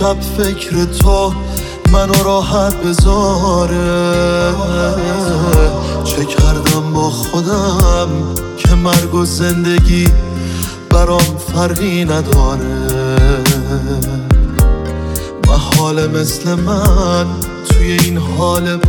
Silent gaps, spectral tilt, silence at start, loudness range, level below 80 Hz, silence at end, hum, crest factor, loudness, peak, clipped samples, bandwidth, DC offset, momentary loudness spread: none; -5.5 dB/octave; 0 s; 1 LU; -16 dBFS; 0 s; none; 12 dB; -13 LUFS; 0 dBFS; under 0.1%; 19.5 kHz; under 0.1%; 6 LU